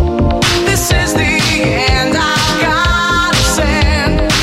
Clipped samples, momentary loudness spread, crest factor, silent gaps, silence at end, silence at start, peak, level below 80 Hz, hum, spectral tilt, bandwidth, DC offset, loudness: under 0.1%; 1 LU; 12 dB; none; 0 s; 0 s; 0 dBFS; -20 dBFS; none; -4 dB/octave; 16.5 kHz; under 0.1%; -12 LUFS